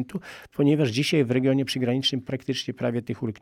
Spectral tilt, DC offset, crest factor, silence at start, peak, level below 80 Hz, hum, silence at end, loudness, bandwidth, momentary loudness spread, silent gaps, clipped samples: -6 dB/octave; under 0.1%; 14 dB; 0 s; -10 dBFS; -64 dBFS; none; 0.1 s; -25 LUFS; 15.5 kHz; 10 LU; none; under 0.1%